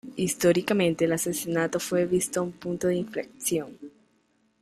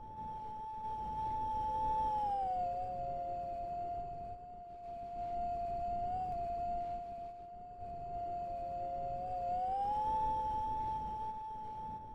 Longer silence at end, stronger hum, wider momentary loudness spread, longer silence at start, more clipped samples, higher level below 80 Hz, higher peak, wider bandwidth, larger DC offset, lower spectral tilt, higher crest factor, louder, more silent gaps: first, 0.75 s vs 0 s; neither; second, 8 LU vs 11 LU; about the same, 0.05 s vs 0 s; neither; second, -62 dBFS vs -54 dBFS; first, -10 dBFS vs -26 dBFS; first, 15.5 kHz vs 9.6 kHz; neither; second, -4.5 dB/octave vs -7.5 dB/octave; first, 18 dB vs 12 dB; first, -26 LUFS vs -39 LUFS; neither